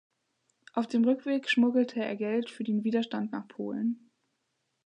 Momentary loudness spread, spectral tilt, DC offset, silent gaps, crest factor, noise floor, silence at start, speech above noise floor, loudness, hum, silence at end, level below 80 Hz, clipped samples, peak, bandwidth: 11 LU; -6 dB/octave; under 0.1%; none; 16 dB; -80 dBFS; 0.75 s; 51 dB; -30 LUFS; none; 0.9 s; -84 dBFS; under 0.1%; -14 dBFS; 9.4 kHz